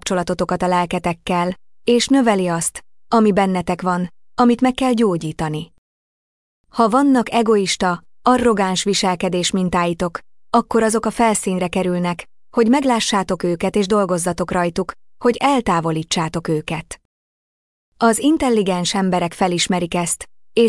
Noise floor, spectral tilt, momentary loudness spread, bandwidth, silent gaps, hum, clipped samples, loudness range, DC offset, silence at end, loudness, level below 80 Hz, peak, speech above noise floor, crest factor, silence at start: under -90 dBFS; -4.5 dB/octave; 9 LU; 12 kHz; 5.78-6.64 s, 17.05-17.92 s; none; under 0.1%; 3 LU; under 0.1%; 0 s; -18 LUFS; -46 dBFS; -4 dBFS; over 73 dB; 14 dB; 0.05 s